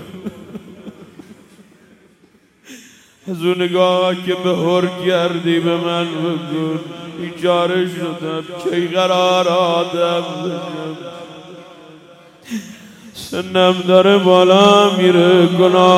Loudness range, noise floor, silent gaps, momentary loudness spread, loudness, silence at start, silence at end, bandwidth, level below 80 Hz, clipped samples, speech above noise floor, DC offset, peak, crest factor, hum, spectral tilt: 12 LU; -52 dBFS; none; 21 LU; -15 LUFS; 0 s; 0 s; 14.5 kHz; -62 dBFS; under 0.1%; 38 dB; under 0.1%; 0 dBFS; 16 dB; none; -5.5 dB/octave